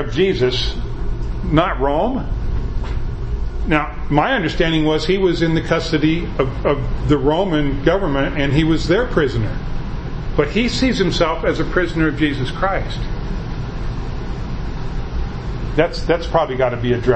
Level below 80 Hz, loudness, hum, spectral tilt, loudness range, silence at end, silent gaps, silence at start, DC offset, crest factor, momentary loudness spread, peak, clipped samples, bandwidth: -24 dBFS; -19 LUFS; none; -6.5 dB/octave; 5 LU; 0 s; none; 0 s; under 0.1%; 18 dB; 11 LU; 0 dBFS; under 0.1%; 8.6 kHz